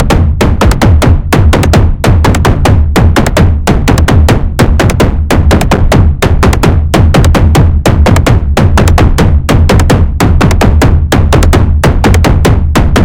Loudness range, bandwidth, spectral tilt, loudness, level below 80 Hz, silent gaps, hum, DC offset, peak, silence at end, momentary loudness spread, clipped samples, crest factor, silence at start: 1 LU; 17 kHz; -6.5 dB/octave; -7 LUFS; -10 dBFS; none; none; under 0.1%; 0 dBFS; 0 s; 2 LU; 6%; 6 dB; 0 s